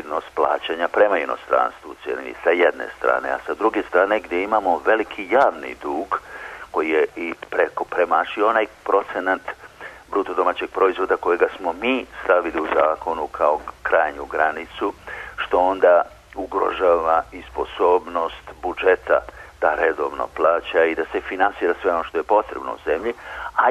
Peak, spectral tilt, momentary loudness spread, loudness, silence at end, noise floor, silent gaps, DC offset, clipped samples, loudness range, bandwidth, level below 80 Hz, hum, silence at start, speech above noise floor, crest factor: -4 dBFS; -5 dB/octave; 11 LU; -21 LUFS; 0 s; -40 dBFS; none; under 0.1%; under 0.1%; 2 LU; 13 kHz; -50 dBFS; none; 0 s; 19 dB; 16 dB